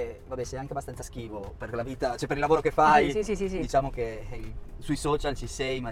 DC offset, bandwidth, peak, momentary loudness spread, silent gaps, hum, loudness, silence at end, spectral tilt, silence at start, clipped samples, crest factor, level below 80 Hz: under 0.1%; 16 kHz; -8 dBFS; 18 LU; none; none; -28 LUFS; 0 s; -5 dB/octave; 0 s; under 0.1%; 20 dB; -40 dBFS